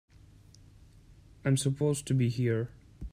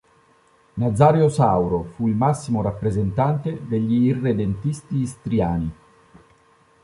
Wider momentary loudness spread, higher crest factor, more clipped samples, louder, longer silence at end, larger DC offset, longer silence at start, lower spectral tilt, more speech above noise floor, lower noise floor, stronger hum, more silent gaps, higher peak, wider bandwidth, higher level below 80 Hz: about the same, 10 LU vs 9 LU; about the same, 16 dB vs 18 dB; neither; second, -30 LUFS vs -21 LUFS; second, 0.05 s vs 1.1 s; neither; first, 1.45 s vs 0.75 s; second, -6 dB/octave vs -8.5 dB/octave; second, 28 dB vs 37 dB; about the same, -56 dBFS vs -57 dBFS; neither; neither; second, -16 dBFS vs -2 dBFS; first, 15 kHz vs 11.5 kHz; second, -54 dBFS vs -44 dBFS